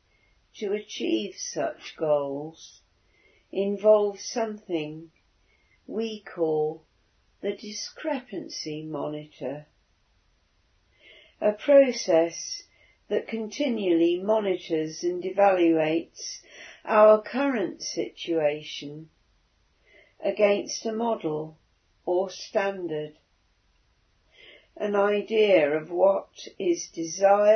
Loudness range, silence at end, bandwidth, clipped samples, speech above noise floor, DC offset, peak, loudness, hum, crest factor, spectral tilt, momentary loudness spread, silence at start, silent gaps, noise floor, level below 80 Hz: 9 LU; 0 s; 6.6 kHz; under 0.1%; 42 dB; under 0.1%; -8 dBFS; -26 LUFS; none; 20 dB; -4.5 dB/octave; 16 LU; 0.55 s; none; -67 dBFS; -72 dBFS